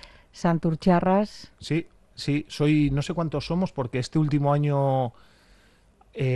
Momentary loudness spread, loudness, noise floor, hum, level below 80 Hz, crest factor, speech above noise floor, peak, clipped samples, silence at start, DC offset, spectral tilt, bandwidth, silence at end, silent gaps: 11 LU; -25 LUFS; -58 dBFS; none; -48 dBFS; 18 dB; 34 dB; -8 dBFS; under 0.1%; 0.05 s; under 0.1%; -7.5 dB/octave; 11.5 kHz; 0 s; none